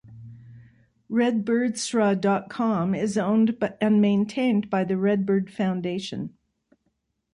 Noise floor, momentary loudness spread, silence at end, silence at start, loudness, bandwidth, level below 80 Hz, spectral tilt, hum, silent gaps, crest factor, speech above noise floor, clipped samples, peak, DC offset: -74 dBFS; 7 LU; 1.05 s; 0.05 s; -24 LUFS; 11 kHz; -64 dBFS; -6 dB/octave; none; none; 14 dB; 51 dB; under 0.1%; -10 dBFS; under 0.1%